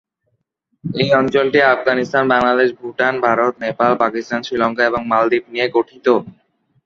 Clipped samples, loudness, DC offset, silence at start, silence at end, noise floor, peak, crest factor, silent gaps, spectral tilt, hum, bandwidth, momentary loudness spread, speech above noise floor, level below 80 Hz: under 0.1%; -16 LUFS; under 0.1%; 0.85 s; 0.55 s; -69 dBFS; 0 dBFS; 16 dB; none; -6 dB/octave; none; 7.2 kHz; 6 LU; 53 dB; -56 dBFS